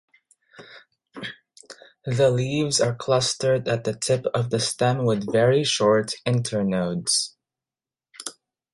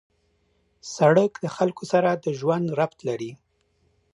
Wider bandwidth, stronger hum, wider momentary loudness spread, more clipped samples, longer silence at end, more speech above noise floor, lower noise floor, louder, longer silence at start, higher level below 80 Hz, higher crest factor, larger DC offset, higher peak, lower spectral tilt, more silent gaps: about the same, 11.5 kHz vs 11 kHz; neither; about the same, 17 LU vs 15 LU; neither; second, 0.4 s vs 0.8 s; first, over 68 dB vs 45 dB; first, under -90 dBFS vs -67 dBFS; about the same, -22 LUFS vs -23 LUFS; second, 0.6 s vs 0.85 s; first, -60 dBFS vs -68 dBFS; about the same, 16 dB vs 20 dB; neither; about the same, -8 dBFS vs -6 dBFS; second, -4.5 dB/octave vs -6.5 dB/octave; neither